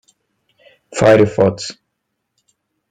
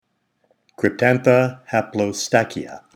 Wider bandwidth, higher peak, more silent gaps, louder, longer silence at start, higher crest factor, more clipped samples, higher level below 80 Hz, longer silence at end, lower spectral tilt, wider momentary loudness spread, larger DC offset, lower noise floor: second, 10 kHz vs 16.5 kHz; about the same, 0 dBFS vs 0 dBFS; neither; first, -13 LUFS vs -19 LUFS; first, 0.95 s vs 0.8 s; about the same, 18 dB vs 20 dB; neither; first, -50 dBFS vs -64 dBFS; first, 1.2 s vs 0.2 s; about the same, -6 dB/octave vs -5.5 dB/octave; first, 17 LU vs 8 LU; neither; first, -74 dBFS vs -65 dBFS